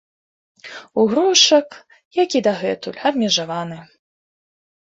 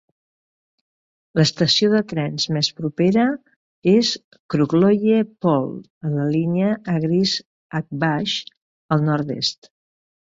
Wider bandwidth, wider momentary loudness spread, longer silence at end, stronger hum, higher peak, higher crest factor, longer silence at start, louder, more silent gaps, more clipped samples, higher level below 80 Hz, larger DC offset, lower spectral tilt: about the same, 8 kHz vs 7.8 kHz; first, 23 LU vs 10 LU; first, 1 s vs 0.75 s; neither; about the same, 0 dBFS vs -2 dBFS; about the same, 20 dB vs 18 dB; second, 0.65 s vs 1.35 s; first, -17 LUFS vs -20 LUFS; second, 2.05-2.11 s vs 3.56-3.82 s, 4.24-4.31 s, 4.40-4.49 s, 5.90-6.01 s, 7.45-7.70 s, 8.57-8.89 s; neither; about the same, -64 dBFS vs -60 dBFS; neither; second, -2.5 dB/octave vs -5.5 dB/octave